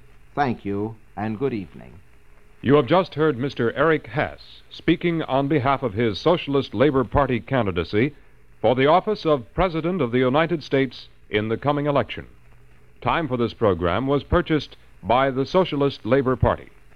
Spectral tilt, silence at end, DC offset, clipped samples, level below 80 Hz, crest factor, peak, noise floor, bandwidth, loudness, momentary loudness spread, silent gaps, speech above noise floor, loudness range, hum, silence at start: -8 dB/octave; 0.3 s; 0.4%; under 0.1%; -42 dBFS; 20 dB; -2 dBFS; -52 dBFS; 6.8 kHz; -22 LUFS; 10 LU; none; 30 dB; 3 LU; none; 0.35 s